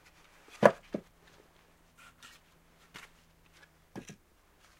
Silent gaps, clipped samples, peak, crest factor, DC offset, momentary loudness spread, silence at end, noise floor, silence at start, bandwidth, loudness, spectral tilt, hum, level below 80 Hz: none; under 0.1%; -2 dBFS; 36 dB; under 0.1%; 28 LU; 0.8 s; -64 dBFS; 0.6 s; 16 kHz; -29 LUFS; -5.5 dB/octave; none; -68 dBFS